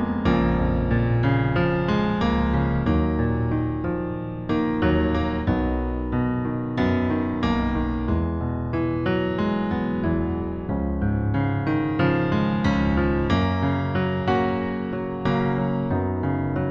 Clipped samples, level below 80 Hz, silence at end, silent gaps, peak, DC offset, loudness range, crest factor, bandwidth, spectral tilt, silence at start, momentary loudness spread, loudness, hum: under 0.1%; -32 dBFS; 0 s; none; -8 dBFS; under 0.1%; 2 LU; 14 dB; 7.2 kHz; -9 dB/octave; 0 s; 5 LU; -23 LUFS; none